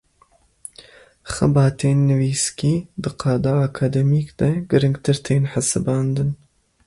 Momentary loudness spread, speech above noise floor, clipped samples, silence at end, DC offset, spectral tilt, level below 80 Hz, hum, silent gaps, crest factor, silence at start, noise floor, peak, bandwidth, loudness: 13 LU; 39 dB; under 0.1%; 0.5 s; under 0.1%; -6 dB/octave; -46 dBFS; none; none; 16 dB; 1.25 s; -58 dBFS; -4 dBFS; 11.5 kHz; -20 LUFS